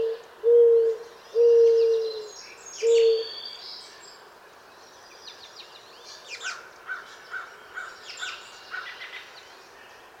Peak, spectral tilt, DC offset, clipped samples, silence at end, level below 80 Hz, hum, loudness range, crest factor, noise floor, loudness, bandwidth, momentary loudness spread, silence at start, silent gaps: -10 dBFS; -0.5 dB/octave; under 0.1%; under 0.1%; 0.95 s; -76 dBFS; none; 19 LU; 16 dB; -50 dBFS; -23 LUFS; 8.4 kHz; 26 LU; 0 s; none